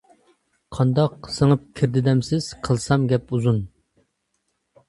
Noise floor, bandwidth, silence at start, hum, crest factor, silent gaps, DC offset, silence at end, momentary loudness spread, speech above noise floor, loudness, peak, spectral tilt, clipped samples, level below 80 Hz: -73 dBFS; 11.5 kHz; 0.7 s; none; 18 dB; none; under 0.1%; 1.2 s; 6 LU; 53 dB; -21 LUFS; -4 dBFS; -7 dB/octave; under 0.1%; -48 dBFS